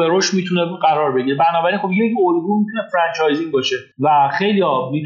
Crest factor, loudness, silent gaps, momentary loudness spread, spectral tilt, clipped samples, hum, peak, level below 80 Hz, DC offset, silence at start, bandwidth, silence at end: 14 dB; -17 LUFS; none; 4 LU; -5 dB/octave; under 0.1%; none; -2 dBFS; -76 dBFS; under 0.1%; 0 s; 7.6 kHz; 0 s